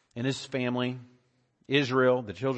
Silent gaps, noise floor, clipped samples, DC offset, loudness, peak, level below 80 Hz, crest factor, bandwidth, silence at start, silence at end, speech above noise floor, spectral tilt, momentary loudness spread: none; -70 dBFS; under 0.1%; under 0.1%; -28 LUFS; -12 dBFS; -72 dBFS; 18 dB; 8.6 kHz; 0.15 s; 0 s; 42 dB; -6 dB/octave; 9 LU